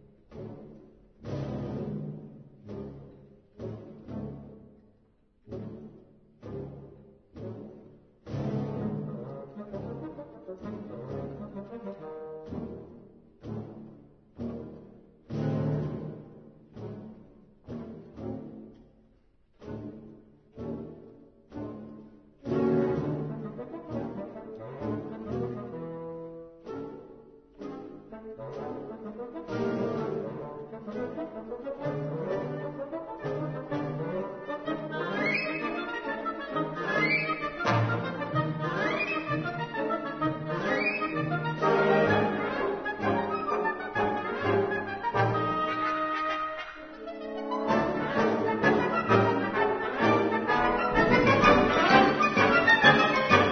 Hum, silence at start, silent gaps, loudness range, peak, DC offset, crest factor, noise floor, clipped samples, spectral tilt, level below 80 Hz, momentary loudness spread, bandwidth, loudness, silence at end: none; 0.3 s; none; 18 LU; -6 dBFS; under 0.1%; 24 dB; -65 dBFS; under 0.1%; -6.5 dB/octave; -56 dBFS; 21 LU; 6.6 kHz; -28 LUFS; 0 s